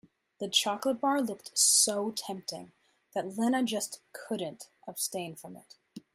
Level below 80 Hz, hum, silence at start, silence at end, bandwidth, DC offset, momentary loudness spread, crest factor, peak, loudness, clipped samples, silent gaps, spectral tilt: -80 dBFS; none; 0.4 s; 0.15 s; 16 kHz; under 0.1%; 20 LU; 22 dB; -10 dBFS; -29 LUFS; under 0.1%; none; -1.5 dB/octave